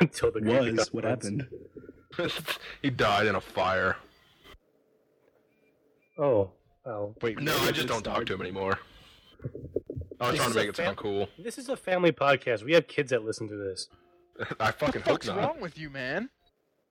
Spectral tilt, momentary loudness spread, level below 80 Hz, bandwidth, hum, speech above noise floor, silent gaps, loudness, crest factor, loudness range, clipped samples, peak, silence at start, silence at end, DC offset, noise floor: -5 dB/octave; 15 LU; -58 dBFS; 19 kHz; none; 42 dB; none; -29 LUFS; 22 dB; 4 LU; under 0.1%; -8 dBFS; 0 s; 0.65 s; under 0.1%; -71 dBFS